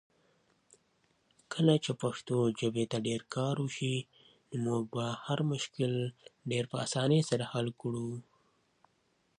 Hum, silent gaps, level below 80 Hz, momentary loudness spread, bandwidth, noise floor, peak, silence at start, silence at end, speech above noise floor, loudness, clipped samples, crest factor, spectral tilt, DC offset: none; none; -74 dBFS; 10 LU; 11 kHz; -74 dBFS; -12 dBFS; 1.5 s; 1.15 s; 42 dB; -33 LUFS; under 0.1%; 22 dB; -6 dB/octave; under 0.1%